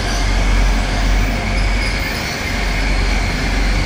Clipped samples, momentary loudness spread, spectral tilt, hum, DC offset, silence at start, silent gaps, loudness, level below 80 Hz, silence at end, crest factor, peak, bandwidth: under 0.1%; 2 LU; -4.5 dB/octave; none; under 0.1%; 0 s; none; -18 LUFS; -18 dBFS; 0 s; 12 dB; -4 dBFS; 16 kHz